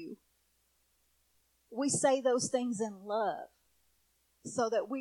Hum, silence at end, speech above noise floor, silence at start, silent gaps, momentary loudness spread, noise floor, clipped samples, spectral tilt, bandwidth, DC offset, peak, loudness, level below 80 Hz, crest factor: none; 0 s; 42 dB; 0 s; none; 18 LU; -74 dBFS; under 0.1%; -3.5 dB/octave; 14.5 kHz; under 0.1%; -16 dBFS; -33 LUFS; -78 dBFS; 20 dB